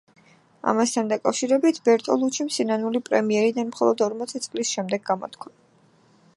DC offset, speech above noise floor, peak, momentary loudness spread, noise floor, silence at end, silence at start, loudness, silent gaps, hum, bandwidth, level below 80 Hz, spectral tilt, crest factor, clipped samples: under 0.1%; 36 dB; -4 dBFS; 9 LU; -58 dBFS; 0.9 s; 0.65 s; -23 LUFS; none; none; 11.5 kHz; -74 dBFS; -4 dB/octave; 20 dB; under 0.1%